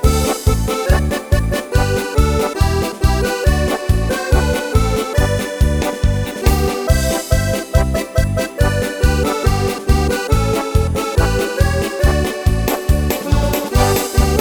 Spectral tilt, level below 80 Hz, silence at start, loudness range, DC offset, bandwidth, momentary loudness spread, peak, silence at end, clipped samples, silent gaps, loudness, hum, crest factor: -5.5 dB/octave; -18 dBFS; 0 s; 0 LU; under 0.1%; 19.5 kHz; 2 LU; 0 dBFS; 0 s; under 0.1%; none; -17 LUFS; none; 14 dB